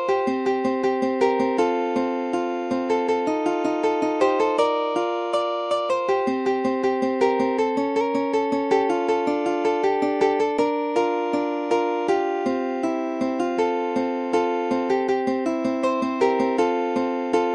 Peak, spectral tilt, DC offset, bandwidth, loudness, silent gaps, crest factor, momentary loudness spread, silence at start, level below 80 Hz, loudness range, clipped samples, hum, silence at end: -8 dBFS; -5 dB/octave; under 0.1%; 11 kHz; -23 LUFS; none; 16 dB; 4 LU; 0 s; -66 dBFS; 2 LU; under 0.1%; none; 0 s